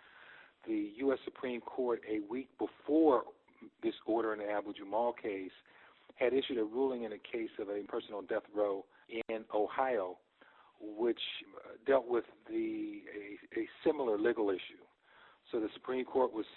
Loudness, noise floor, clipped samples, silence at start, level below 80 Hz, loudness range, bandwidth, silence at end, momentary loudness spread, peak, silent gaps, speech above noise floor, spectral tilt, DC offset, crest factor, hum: -36 LUFS; -64 dBFS; under 0.1%; 0.15 s; -76 dBFS; 3 LU; 4.3 kHz; 0 s; 13 LU; -16 dBFS; none; 28 dB; -2.5 dB/octave; under 0.1%; 20 dB; none